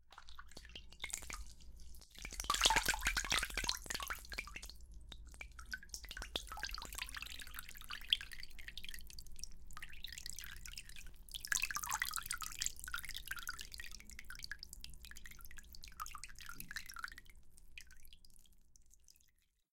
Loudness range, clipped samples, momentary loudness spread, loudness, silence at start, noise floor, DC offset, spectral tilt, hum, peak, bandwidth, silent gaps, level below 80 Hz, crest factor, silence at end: 14 LU; under 0.1%; 20 LU; -42 LUFS; 0 s; -74 dBFS; under 0.1%; 0 dB/octave; none; -12 dBFS; 17 kHz; none; -54 dBFS; 32 dB; 0.5 s